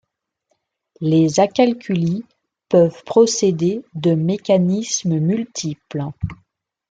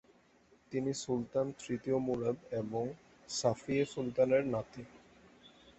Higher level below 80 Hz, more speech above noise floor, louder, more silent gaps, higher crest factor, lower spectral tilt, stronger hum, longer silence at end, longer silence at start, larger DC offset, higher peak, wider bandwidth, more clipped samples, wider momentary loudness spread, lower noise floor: first, -52 dBFS vs -68 dBFS; first, 54 dB vs 32 dB; first, -18 LUFS vs -35 LUFS; neither; about the same, 16 dB vs 20 dB; about the same, -6 dB/octave vs -5.5 dB/octave; neither; first, 0.55 s vs 0.1 s; first, 1 s vs 0.7 s; neither; first, -2 dBFS vs -16 dBFS; first, 9.2 kHz vs 8.2 kHz; neither; about the same, 12 LU vs 12 LU; first, -72 dBFS vs -67 dBFS